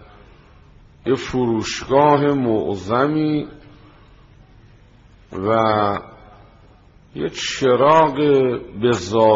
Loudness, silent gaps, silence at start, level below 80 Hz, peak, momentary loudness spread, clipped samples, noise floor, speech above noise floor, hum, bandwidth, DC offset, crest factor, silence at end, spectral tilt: -18 LUFS; none; 1.05 s; -50 dBFS; -2 dBFS; 13 LU; under 0.1%; -49 dBFS; 31 dB; none; 7.8 kHz; under 0.1%; 18 dB; 0 s; -5 dB/octave